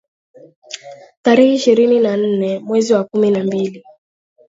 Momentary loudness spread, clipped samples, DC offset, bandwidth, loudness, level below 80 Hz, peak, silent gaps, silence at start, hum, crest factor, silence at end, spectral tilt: 19 LU; under 0.1%; under 0.1%; 7.8 kHz; -15 LUFS; -66 dBFS; 0 dBFS; 1.17-1.23 s; 0.7 s; none; 16 dB; 0.7 s; -5.5 dB/octave